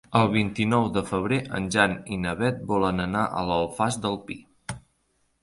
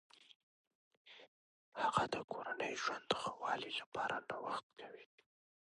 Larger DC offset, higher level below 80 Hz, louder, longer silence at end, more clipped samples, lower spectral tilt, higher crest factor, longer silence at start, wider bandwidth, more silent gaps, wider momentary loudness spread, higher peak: neither; first, -50 dBFS vs -78 dBFS; first, -25 LUFS vs -41 LUFS; about the same, 0.65 s vs 0.65 s; neither; first, -5.5 dB/octave vs -3 dB/octave; second, 20 dB vs 26 dB; about the same, 0.1 s vs 0.2 s; about the same, 11.5 kHz vs 11 kHz; second, none vs 0.35-0.91 s, 0.97-1.05 s, 1.28-1.72 s, 2.24-2.28 s, 3.86-3.92 s, 4.63-4.70 s; second, 16 LU vs 22 LU; first, -4 dBFS vs -18 dBFS